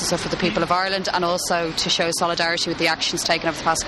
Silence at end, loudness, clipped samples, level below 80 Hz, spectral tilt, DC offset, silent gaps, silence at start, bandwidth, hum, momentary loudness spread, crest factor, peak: 0 s; -21 LUFS; under 0.1%; -46 dBFS; -2.5 dB/octave; under 0.1%; none; 0 s; 13 kHz; none; 2 LU; 16 dB; -4 dBFS